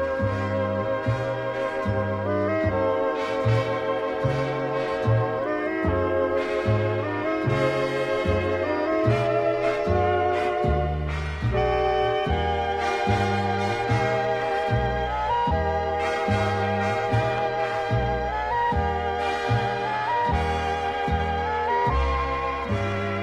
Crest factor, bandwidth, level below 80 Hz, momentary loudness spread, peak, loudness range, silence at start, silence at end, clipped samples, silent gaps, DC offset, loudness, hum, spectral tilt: 14 dB; 10.5 kHz; -36 dBFS; 3 LU; -8 dBFS; 1 LU; 0 s; 0 s; under 0.1%; none; under 0.1%; -24 LUFS; none; -7 dB/octave